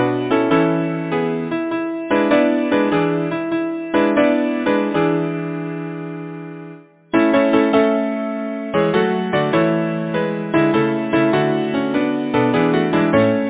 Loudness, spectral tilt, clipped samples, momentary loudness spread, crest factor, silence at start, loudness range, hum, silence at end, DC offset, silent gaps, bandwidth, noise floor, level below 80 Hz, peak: -18 LUFS; -11 dB/octave; under 0.1%; 10 LU; 16 dB; 0 s; 2 LU; none; 0 s; under 0.1%; none; 4 kHz; -39 dBFS; -54 dBFS; 0 dBFS